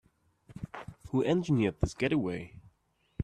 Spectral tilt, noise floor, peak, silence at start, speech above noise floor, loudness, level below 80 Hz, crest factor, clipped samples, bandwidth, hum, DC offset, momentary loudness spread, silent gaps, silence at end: -7 dB/octave; -73 dBFS; -12 dBFS; 0.5 s; 43 dB; -31 LUFS; -50 dBFS; 20 dB; under 0.1%; 11 kHz; none; under 0.1%; 18 LU; none; 0 s